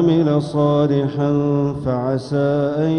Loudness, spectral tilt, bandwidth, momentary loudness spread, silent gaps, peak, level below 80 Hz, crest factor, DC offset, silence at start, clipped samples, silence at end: -18 LUFS; -9 dB/octave; 9.8 kHz; 5 LU; none; -4 dBFS; -48 dBFS; 12 dB; under 0.1%; 0 s; under 0.1%; 0 s